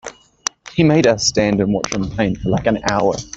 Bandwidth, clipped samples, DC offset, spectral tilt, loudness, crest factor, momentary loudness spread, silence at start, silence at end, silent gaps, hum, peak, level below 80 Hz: 8.4 kHz; under 0.1%; under 0.1%; -5 dB/octave; -17 LUFS; 18 dB; 12 LU; 0.05 s; 0.1 s; none; none; 0 dBFS; -40 dBFS